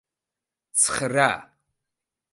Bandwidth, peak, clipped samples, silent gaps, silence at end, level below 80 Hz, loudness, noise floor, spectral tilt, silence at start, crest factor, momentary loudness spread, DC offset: 12 kHz; -4 dBFS; under 0.1%; none; 0.9 s; -62 dBFS; -22 LUFS; -88 dBFS; -2 dB/octave; 0.75 s; 24 dB; 7 LU; under 0.1%